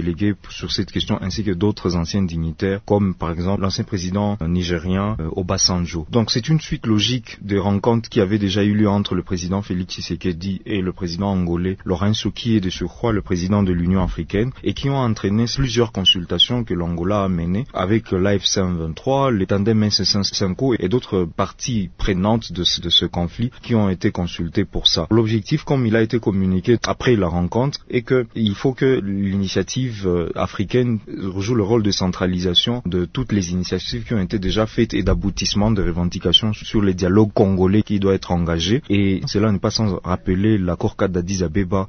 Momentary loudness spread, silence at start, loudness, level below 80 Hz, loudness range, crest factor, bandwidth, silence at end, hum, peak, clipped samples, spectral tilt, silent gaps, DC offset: 7 LU; 0 s; -19 LUFS; -36 dBFS; 3 LU; 18 dB; 6.6 kHz; 0 s; none; 0 dBFS; under 0.1%; -5.5 dB/octave; none; under 0.1%